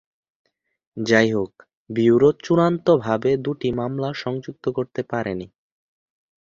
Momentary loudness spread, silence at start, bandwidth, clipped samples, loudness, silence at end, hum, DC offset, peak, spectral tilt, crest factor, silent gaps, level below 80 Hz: 12 LU; 0.95 s; 7.4 kHz; under 0.1%; -21 LUFS; 1.05 s; none; under 0.1%; -2 dBFS; -7 dB/octave; 20 dB; 1.77-1.86 s; -56 dBFS